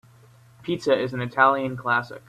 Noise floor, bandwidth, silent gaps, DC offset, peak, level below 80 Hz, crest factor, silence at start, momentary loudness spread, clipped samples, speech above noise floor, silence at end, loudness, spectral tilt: -52 dBFS; 13 kHz; none; under 0.1%; -4 dBFS; -62 dBFS; 20 dB; 0.65 s; 10 LU; under 0.1%; 30 dB; 0.1 s; -23 LUFS; -6 dB/octave